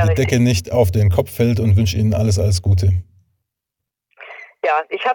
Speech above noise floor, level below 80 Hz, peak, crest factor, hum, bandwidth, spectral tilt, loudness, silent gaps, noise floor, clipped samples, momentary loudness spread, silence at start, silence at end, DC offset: 67 dB; -36 dBFS; 0 dBFS; 16 dB; none; 17.5 kHz; -6.5 dB/octave; -17 LUFS; none; -82 dBFS; under 0.1%; 8 LU; 0 s; 0 s; under 0.1%